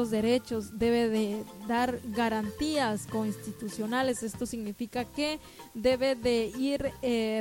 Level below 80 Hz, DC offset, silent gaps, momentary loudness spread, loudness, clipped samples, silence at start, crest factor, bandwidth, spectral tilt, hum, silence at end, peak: -54 dBFS; under 0.1%; none; 9 LU; -30 LUFS; under 0.1%; 0 s; 16 dB; 17 kHz; -4.5 dB/octave; none; 0 s; -14 dBFS